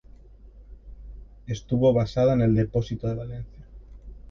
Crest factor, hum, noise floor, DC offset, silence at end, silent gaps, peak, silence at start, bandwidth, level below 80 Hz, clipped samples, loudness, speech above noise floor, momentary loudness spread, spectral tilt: 18 dB; none; -48 dBFS; under 0.1%; 0.05 s; none; -8 dBFS; 0.45 s; 7 kHz; -44 dBFS; under 0.1%; -24 LUFS; 25 dB; 24 LU; -8.5 dB/octave